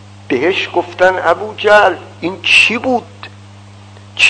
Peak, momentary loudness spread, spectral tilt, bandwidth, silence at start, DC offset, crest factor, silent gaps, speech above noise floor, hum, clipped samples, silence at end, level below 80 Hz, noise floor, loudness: 0 dBFS; 19 LU; -3 dB/octave; 11 kHz; 0.3 s; under 0.1%; 14 dB; none; 24 dB; none; 0.4%; 0 s; -54 dBFS; -36 dBFS; -12 LUFS